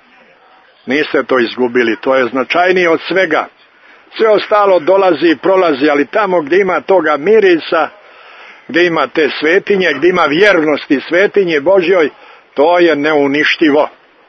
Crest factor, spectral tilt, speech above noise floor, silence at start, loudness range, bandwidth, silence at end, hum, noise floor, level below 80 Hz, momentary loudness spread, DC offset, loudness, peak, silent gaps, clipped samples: 12 dB; -5.5 dB/octave; 35 dB; 0.85 s; 2 LU; 6.4 kHz; 0.4 s; none; -45 dBFS; -58 dBFS; 6 LU; under 0.1%; -11 LUFS; 0 dBFS; none; under 0.1%